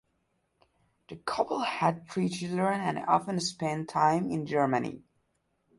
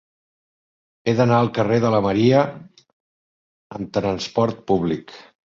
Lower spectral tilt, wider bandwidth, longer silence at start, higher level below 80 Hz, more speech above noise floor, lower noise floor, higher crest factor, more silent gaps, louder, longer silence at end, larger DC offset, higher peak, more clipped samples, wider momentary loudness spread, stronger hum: second, -5.5 dB/octave vs -7 dB/octave; first, 11.5 kHz vs 7.4 kHz; about the same, 1.1 s vs 1.05 s; second, -68 dBFS vs -52 dBFS; second, 46 dB vs over 71 dB; second, -76 dBFS vs under -90 dBFS; about the same, 20 dB vs 18 dB; second, none vs 2.93-3.70 s; second, -29 LUFS vs -20 LUFS; first, 0.8 s vs 0.35 s; neither; second, -12 dBFS vs -2 dBFS; neither; about the same, 9 LU vs 11 LU; neither